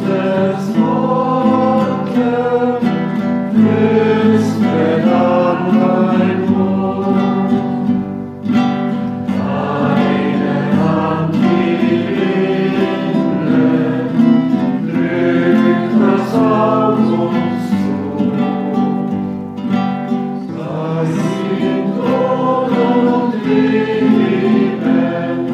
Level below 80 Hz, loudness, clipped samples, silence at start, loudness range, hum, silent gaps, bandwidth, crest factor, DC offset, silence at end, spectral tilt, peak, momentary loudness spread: -56 dBFS; -15 LUFS; under 0.1%; 0 s; 4 LU; none; none; 8.6 kHz; 14 dB; under 0.1%; 0 s; -8 dB/octave; 0 dBFS; 6 LU